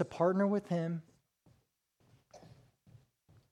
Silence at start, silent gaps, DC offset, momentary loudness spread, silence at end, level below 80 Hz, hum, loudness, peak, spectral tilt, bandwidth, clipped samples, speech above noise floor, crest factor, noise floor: 0 s; none; under 0.1%; 10 LU; 1.05 s; -76 dBFS; none; -33 LUFS; -18 dBFS; -8.5 dB/octave; 10.5 kHz; under 0.1%; 43 dB; 20 dB; -75 dBFS